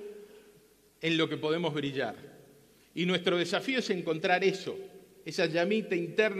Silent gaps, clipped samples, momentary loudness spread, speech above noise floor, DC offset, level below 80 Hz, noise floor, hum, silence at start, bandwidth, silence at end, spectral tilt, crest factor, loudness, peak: none; under 0.1%; 16 LU; 32 dB; under 0.1%; -76 dBFS; -62 dBFS; none; 0 s; 14.5 kHz; 0 s; -5 dB/octave; 20 dB; -30 LUFS; -12 dBFS